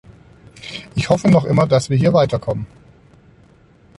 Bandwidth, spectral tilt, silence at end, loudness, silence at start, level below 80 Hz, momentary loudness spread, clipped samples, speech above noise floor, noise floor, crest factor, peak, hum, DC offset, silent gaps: 11.5 kHz; -7 dB/octave; 1.35 s; -16 LUFS; 0.65 s; -46 dBFS; 18 LU; under 0.1%; 34 dB; -50 dBFS; 16 dB; -2 dBFS; none; under 0.1%; none